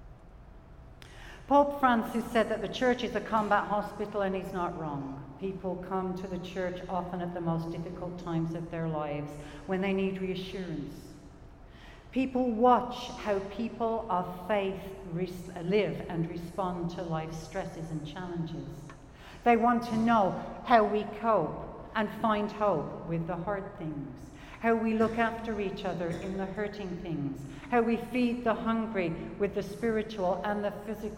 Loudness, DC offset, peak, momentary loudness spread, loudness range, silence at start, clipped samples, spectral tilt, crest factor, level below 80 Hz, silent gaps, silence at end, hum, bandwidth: -31 LUFS; under 0.1%; -10 dBFS; 13 LU; 7 LU; 0 s; under 0.1%; -7 dB/octave; 22 dB; -52 dBFS; none; 0 s; none; 16.5 kHz